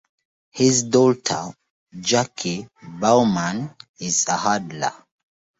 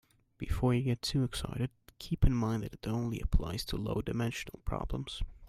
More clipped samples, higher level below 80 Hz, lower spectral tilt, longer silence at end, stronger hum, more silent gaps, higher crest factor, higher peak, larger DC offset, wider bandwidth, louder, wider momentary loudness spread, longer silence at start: neither; second, -60 dBFS vs -38 dBFS; second, -4 dB/octave vs -6 dB/octave; first, 0.65 s vs 0 s; neither; first, 1.70-1.87 s, 3.89-3.94 s vs none; about the same, 18 dB vs 20 dB; first, -4 dBFS vs -14 dBFS; neither; second, 8 kHz vs 15.5 kHz; first, -20 LUFS vs -35 LUFS; first, 15 LU vs 9 LU; first, 0.55 s vs 0.4 s